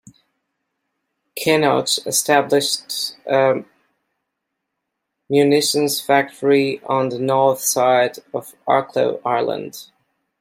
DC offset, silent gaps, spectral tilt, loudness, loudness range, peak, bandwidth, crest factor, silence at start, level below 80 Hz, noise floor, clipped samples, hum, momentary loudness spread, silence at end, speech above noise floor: under 0.1%; none; -3.5 dB/octave; -18 LUFS; 3 LU; -2 dBFS; 16.5 kHz; 18 dB; 1.35 s; -68 dBFS; -78 dBFS; under 0.1%; none; 9 LU; 0.55 s; 60 dB